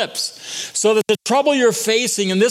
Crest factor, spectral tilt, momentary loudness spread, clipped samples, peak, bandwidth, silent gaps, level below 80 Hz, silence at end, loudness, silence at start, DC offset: 14 dB; -3 dB/octave; 8 LU; under 0.1%; -4 dBFS; 16 kHz; none; -72 dBFS; 0 s; -17 LUFS; 0 s; under 0.1%